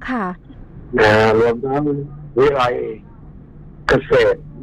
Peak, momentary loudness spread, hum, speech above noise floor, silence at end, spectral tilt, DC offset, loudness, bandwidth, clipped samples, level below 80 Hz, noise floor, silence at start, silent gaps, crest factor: 0 dBFS; 14 LU; none; 23 dB; 0 s; -6.5 dB/octave; under 0.1%; -17 LUFS; 10.5 kHz; under 0.1%; -38 dBFS; -39 dBFS; 0 s; none; 16 dB